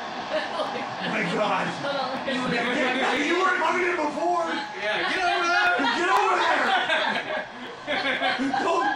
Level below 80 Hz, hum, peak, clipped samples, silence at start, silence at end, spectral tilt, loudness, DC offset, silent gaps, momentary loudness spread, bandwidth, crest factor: -64 dBFS; none; -10 dBFS; under 0.1%; 0 s; 0 s; -3.5 dB/octave; -24 LUFS; under 0.1%; none; 8 LU; 16 kHz; 14 dB